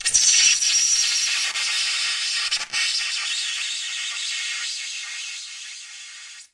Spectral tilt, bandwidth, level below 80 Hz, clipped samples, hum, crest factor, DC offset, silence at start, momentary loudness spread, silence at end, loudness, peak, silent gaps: 5 dB/octave; 12 kHz; -64 dBFS; under 0.1%; none; 20 dB; under 0.1%; 0 s; 19 LU; 0.1 s; -20 LUFS; -4 dBFS; none